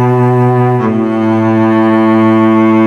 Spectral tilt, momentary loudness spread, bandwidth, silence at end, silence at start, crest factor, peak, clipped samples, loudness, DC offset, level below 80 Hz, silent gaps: -9.5 dB/octave; 4 LU; 6.6 kHz; 0 s; 0 s; 8 dB; 0 dBFS; under 0.1%; -9 LUFS; under 0.1%; -52 dBFS; none